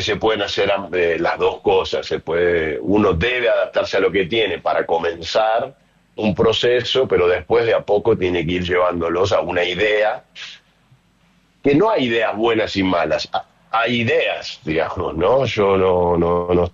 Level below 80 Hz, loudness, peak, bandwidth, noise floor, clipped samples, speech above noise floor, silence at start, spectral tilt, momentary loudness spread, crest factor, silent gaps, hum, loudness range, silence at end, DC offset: -44 dBFS; -18 LUFS; -6 dBFS; 7.6 kHz; -57 dBFS; under 0.1%; 39 dB; 0 s; -5.5 dB/octave; 6 LU; 12 dB; none; none; 2 LU; 0.05 s; under 0.1%